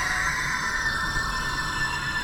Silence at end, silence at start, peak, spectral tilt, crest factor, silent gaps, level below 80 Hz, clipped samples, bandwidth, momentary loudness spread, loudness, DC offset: 0 s; 0 s; -14 dBFS; -2 dB/octave; 14 dB; none; -38 dBFS; under 0.1%; 18 kHz; 2 LU; -25 LUFS; under 0.1%